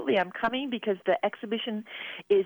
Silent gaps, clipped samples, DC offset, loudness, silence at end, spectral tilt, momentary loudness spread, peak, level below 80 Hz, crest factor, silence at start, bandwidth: none; under 0.1%; under 0.1%; -30 LUFS; 0 s; -6.5 dB/octave; 9 LU; -14 dBFS; -68 dBFS; 16 dB; 0 s; over 20 kHz